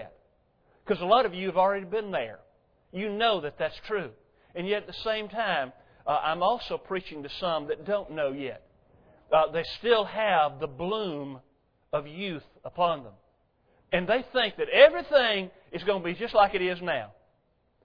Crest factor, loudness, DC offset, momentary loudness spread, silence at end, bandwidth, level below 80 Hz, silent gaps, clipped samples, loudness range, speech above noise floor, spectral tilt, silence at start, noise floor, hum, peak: 26 dB; -27 LUFS; under 0.1%; 15 LU; 0.75 s; 5.4 kHz; -58 dBFS; none; under 0.1%; 7 LU; 43 dB; -6.5 dB/octave; 0 s; -70 dBFS; none; -4 dBFS